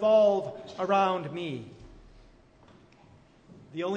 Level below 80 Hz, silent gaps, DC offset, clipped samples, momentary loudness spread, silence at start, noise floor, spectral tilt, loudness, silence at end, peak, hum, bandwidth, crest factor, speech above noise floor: -60 dBFS; none; under 0.1%; under 0.1%; 19 LU; 0 s; -57 dBFS; -6.5 dB/octave; -28 LUFS; 0 s; -12 dBFS; none; 7.8 kHz; 18 dB; 31 dB